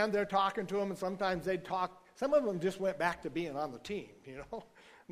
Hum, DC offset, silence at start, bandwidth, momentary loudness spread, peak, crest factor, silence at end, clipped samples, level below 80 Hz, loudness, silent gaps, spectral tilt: none; under 0.1%; 0 s; 15.5 kHz; 15 LU; -16 dBFS; 20 dB; 0.2 s; under 0.1%; -64 dBFS; -35 LUFS; none; -5.5 dB/octave